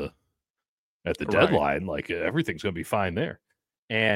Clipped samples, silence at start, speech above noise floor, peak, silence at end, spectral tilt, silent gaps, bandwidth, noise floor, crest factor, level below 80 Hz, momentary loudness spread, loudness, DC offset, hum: under 0.1%; 0 s; 54 dB; -6 dBFS; 0 s; -6 dB/octave; 0.50-0.54 s, 0.68-1.00 s, 3.78-3.88 s; 16.5 kHz; -80 dBFS; 22 dB; -52 dBFS; 12 LU; -26 LUFS; under 0.1%; none